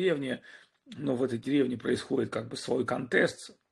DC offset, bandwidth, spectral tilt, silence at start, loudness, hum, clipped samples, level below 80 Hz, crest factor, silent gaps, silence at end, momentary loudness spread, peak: under 0.1%; 12 kHz; -5.5 dB/octave; 0 s; -30 LUFS; none; under 0.1%; -70 dBFS; 20 dB; none; 0.2 s; 10 LU; -12 dBFS